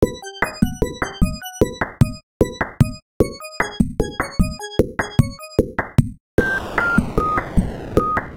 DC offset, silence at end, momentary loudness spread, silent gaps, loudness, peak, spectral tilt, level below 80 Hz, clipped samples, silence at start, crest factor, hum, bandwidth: under 0.1%; 0 s; 4 LU; 2.23-2.40 s, 3.02-3.20 s, 6.20-6.38 s; -21 LUFS; -2 dBFS; -6.5 dB/octave; -30 dBFS; under 0.1%; 0 s; 18 dB; none; 17 kHz